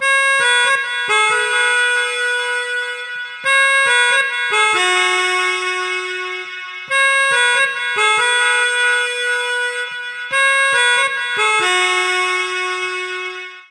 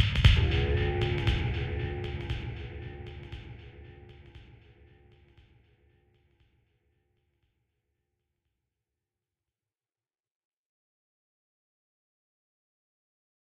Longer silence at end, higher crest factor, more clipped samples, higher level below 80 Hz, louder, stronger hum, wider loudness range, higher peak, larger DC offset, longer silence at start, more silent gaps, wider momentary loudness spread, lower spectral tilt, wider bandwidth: second, 0.1 s vs 9 s; second, 14 dB vs 28 dB; neither; second, -76 dBFS vs -38 dBFS; first, -15 LUFS vs -29 LUFS; neither; second, 1 LU vs 25 LU; first, -2 dBFS vs -6 dBFS; neither; about the same, 0 s vs 0 s; neither; second, 11 LU vs 27 LU; second, 1 dB/octave vs -6.5 dB/octave; first, 13.5 kHz vs 9 kHz